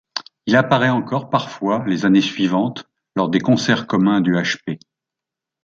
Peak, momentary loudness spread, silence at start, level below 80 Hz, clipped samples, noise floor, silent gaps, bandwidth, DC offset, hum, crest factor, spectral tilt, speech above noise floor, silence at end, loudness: 0 dBFS; 11 LU; 0.15 s; -60 dBFS; under 0.1%; -85 dBFS; none; 7.6 kHz; under 0.1%; none; 18 dB; -6 dB/octave; 68 dB; 0.85 s; -18 LUFS